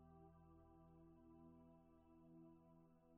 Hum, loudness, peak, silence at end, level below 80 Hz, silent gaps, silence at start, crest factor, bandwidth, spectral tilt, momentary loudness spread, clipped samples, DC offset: none; -68 LUFS; -56 dBFS; 0 s; -80 dBFS; none; 0 s; 12 dB; 3 kHz; -8 dB/octave; 2 LU; under 0.1%; under 0.1%